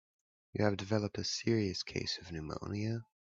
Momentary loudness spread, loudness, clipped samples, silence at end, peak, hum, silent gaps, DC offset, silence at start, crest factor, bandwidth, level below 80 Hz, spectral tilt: 8 LU; -36 LUFS; under 0.1%; 0.25 s; -16 dBFS; none; none; under 0.1%; 0.55 s; 22 dB; 7.8 kHz; -64 dBFS; -5 dB/octave